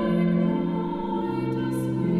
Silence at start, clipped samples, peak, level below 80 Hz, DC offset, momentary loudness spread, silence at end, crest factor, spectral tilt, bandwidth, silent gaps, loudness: 0 s; under 0.1%; -14 dBFS; -50 dBFS; under 0.1%; 5 LU; 0 s; 12 dB; -8.5 dB/octave; 13 kHz; none; -26 LUFS